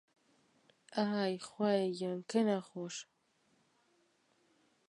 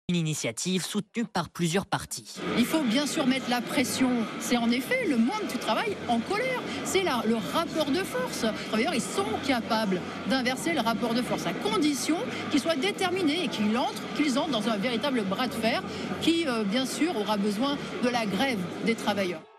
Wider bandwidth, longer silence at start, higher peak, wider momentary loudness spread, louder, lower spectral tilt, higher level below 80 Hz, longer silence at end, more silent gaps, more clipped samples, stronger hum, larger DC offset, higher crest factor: second, 11 kHz vs 14 kHz; first, 0.9 s vs 0.1 s; second, -18 dBFS vs -12 dBFS; first, 11 LU vs 4 LU; second, -36 LUFS vs -28 LUFS; first, -5.5 dB/octave vs -4 dB/octave; second, -88 dBFS vs -64 dBFS; first, 1.85 s vs 0.15 s; neither; neither; neither; neither; about the same, 20 dB vs 16 dB